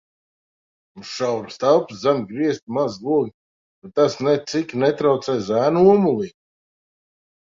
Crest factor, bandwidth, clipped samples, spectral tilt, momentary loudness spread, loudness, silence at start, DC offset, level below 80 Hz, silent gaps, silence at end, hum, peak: 18 dB; 7.6 kHz; under 0.1%; -6.5 dB/octave; 11 LU; -20 LUFS; 0.95 s; under 0.1%; -62 dBFS; 2.62-2.67 s, 3.34-3.82 s; 1.3 s; none; -2 dBFS